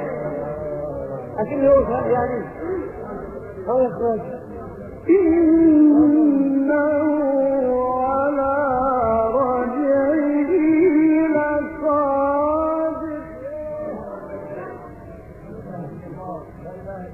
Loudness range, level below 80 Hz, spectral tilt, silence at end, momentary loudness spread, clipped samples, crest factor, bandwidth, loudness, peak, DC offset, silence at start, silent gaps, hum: 13 LU; -46 dBFS; -11 dB/octave; 0 s; 19 LU; under 0.1%; 14 dB; 2.9 kHz; -19 LUFS; -6 dBFS; under 0.1%; 0 s; none; none